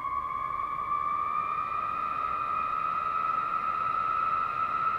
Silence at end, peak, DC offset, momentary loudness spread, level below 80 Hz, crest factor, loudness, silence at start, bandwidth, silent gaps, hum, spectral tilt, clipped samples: 0 s; -18 dBFS; under 0.1%; 4 LU; -58 dBFS; 12 dB; -29 LUFS; 0 s; 7.6 kHz; none; none; -5 dB/octave; under 0.1%